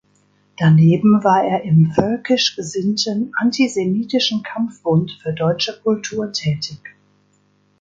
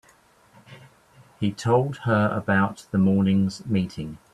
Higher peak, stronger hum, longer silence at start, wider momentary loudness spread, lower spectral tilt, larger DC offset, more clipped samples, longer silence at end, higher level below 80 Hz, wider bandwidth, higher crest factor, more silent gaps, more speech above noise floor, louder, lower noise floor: first, 0 dBFS vs -8 dBFS; first, 50 Hz at -40 dBFS vs none; about the same, 0.6 s vs 0.7 s; about the same, 10 LU vs 9 LU; second, -6 dB/octave vs -7.5 dB/octave; neither; neither; first, 0.9 s vs 0.15 s; about the same, -56 dBFS vs -56 dBFS; second, 7.8 kHz vs 11 kHz; about the same, 18 dB vs 16 dB; neither; first, 43 dB vs 35 dB; first, -17 LUFS vs -23 LUFS; about the same, -59 dBFS vs -57 dBFS